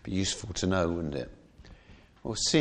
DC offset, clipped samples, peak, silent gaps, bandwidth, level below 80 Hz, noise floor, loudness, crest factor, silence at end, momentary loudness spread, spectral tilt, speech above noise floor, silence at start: under 0.1%; under 0.1%; -10 dBFS; none; 10.5 kHz; -50 dBFS; -55 dBFS; -30 LUFS; 20 dB; 0 s; 13 LU; -4 dB/octave; 26 dB; 0.05 s